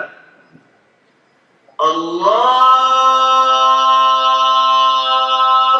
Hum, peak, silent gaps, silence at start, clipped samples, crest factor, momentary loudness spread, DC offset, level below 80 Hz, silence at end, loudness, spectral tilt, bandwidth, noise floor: none; 0 dBFS; none; 0 s; under 0.1%; 12 dB; 7 LU; under 0.1%; -82 dBFS; 0 s; -12 LUFS; -1.5 dB/octave; 8 kHz; -55 dBFS